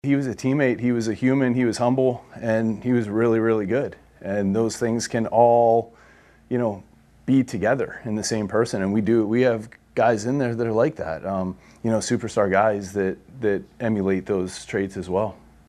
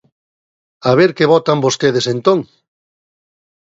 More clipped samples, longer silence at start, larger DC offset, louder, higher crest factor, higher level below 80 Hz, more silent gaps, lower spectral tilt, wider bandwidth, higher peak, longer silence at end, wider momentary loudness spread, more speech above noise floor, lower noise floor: neither; second, 0.05 s vs 0.85 s; neither; second, -23 LUFS vs -14 LUFS; about the same, 18 dB vs 16 dB; about the same, -56 dBFS vs -58 dBFS; neither; about the same, -6 dB/octave vs -5 dB/octave; first, 13 kHz vs 7.8 kHz; second, -4 dBFS vs 0 dBFS; second, 0.35 s vs 1.25 s; first, 8 LU vs 5 LU; second, 30 dB vs over 77 dB; second, -52 dBFS vs under -90 dBFS